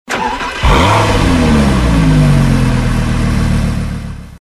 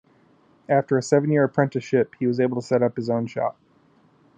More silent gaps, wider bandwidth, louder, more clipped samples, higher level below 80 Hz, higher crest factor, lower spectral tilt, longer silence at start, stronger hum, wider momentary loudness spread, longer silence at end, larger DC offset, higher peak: neither; first, 13 kHz vs 9.2 kHz; first, -12 LUFS vs -22 LUFS; neither; first, -18 dBFS vs -72 dBFS; second, 10 dB vs 20 dB; about the same, -6 dB/octave vs -7 dB/octave; second, 0.1 s vs 0.7 s; neither; about the same, 8 LU vs 6 LU; second, 0.05 s vs 0.85 s; neither; about the same, -2 dBFS vs -4 dBFS